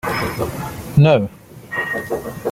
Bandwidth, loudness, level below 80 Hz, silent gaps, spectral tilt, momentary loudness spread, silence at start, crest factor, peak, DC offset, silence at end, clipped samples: 16 kHz; -19 LUFS; -42 dBFS; none; -7 dB/octave; 13 LU; 0.05 s; 18 dB; -2 dBFS; under 0.1%; 0 s; under 0.1%